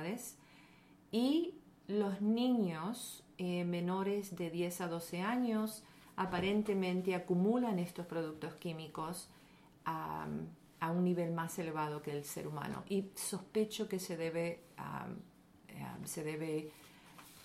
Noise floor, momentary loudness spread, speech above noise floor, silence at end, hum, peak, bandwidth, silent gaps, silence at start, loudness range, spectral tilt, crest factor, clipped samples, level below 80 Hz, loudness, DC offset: -63 dBFS; 14 LU; 25 dB; 0 s; none; -22 dBFS; 16 kHz; none; 0 s; 5 LU; -5.5 dB/octave; 16 dB; under 0.1%; -72 dBFS; -39 LUFS; under 0.1%